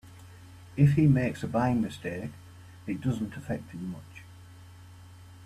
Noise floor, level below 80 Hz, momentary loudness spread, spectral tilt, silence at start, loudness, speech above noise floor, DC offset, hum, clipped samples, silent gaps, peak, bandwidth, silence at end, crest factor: -49 dBFS; -56 dBFS; 27 LU; -8.5 dB/octave; 0.05 s; -28 LUFS; 22 dB; under 0.1%; none; under 0.1%; none; -10 dBFS; 12.5 kHz; 0 s; 20 dB